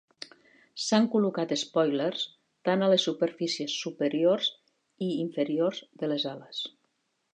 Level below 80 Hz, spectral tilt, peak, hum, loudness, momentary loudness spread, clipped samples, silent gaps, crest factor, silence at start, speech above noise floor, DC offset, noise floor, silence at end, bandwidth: -82 dBFS; -4.5 dB/octave; -10 dBFS; none; -28 LUFS; 12 LU; under 0.1%; none; 18 dB; 0.2 s; 48 dB; under 0.1%; -76 dBFS; 0.65 s; 10 kHz